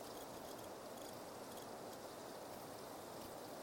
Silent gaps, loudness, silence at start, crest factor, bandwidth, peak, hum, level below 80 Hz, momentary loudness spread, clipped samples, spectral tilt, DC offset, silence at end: none; -52 LUFS; 0 s; 14 dB; 17 kHz; -38 dBFS; none; -76 dBFS; 1 LU; under 0.1%; -3.5 dB/octave; under 0.1%; 0 s